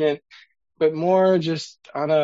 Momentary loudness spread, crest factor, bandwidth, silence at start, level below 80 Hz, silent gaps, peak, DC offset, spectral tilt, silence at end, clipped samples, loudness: 13 LU; 14 dB; 8 kHz; 0 s; -70 dBFS; none; -6 dBFS; under 0.1%; -6.5 dB/octave; 0 s; under 0.1%; -21 LUFS